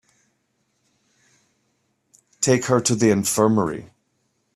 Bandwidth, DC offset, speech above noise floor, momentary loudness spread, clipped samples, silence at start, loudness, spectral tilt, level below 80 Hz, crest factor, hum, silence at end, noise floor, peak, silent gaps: 14.5 kHz; under 0.1%; 51 dB; 8 LU; under 0.1%; 2.4 s; -19 LUFS; -4.5 dB/octave; -60 dBFS; 20 dB; none; 0.7 s; -70 dBFS; -4 dBFS; none